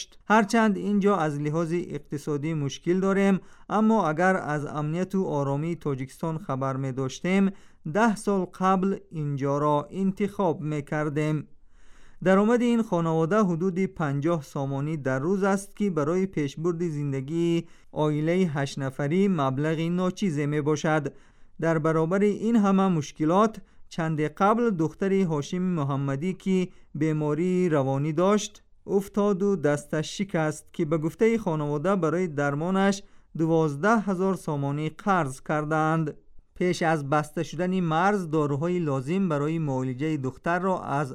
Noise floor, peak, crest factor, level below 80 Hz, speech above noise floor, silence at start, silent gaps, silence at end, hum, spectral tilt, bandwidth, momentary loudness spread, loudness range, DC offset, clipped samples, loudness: -47 dBFS; -8 dBFS; 16 dB; -56 dBFS; 21 dB; 0 s; none; 0 s; none; -7 dB/octave; 13 kHz; 7 LU; 2 LU; under 0.1%; under 0.1%; -26 LUFS